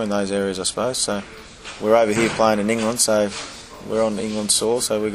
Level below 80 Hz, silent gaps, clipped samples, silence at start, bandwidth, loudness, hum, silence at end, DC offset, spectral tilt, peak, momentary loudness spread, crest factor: -50 dBFS; none; under 0.1%; 0 s; 15 kHz; -20 LUFS; none; 0 s; under 0.1%; -3 dB/octave; -2 dBFS; 15 LU; 20 dB